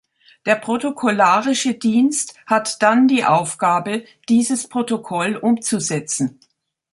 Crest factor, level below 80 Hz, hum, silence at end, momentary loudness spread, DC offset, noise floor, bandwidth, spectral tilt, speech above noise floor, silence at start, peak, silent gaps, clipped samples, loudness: 18 dB; -64 dBFS; none; 0.65 s; 8 LU; under 0.1%; -61 dBFS; 11.5 kHz; -4 dB/octave; 43 dB; 0.45 s; -2 dBFS; none; under 0.1%; -18 LUFS